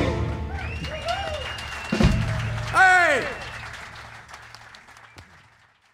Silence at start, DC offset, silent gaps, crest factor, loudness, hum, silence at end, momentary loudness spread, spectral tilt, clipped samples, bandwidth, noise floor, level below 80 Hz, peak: 0 s; under 0.1%; none; 20 dB; -23 LUFS; none; 0.7 s; 25 LU; -5 dB/octave; under 0.1%; 16 kHz; -57 dBFS; -36 dBFS; -6 dBFS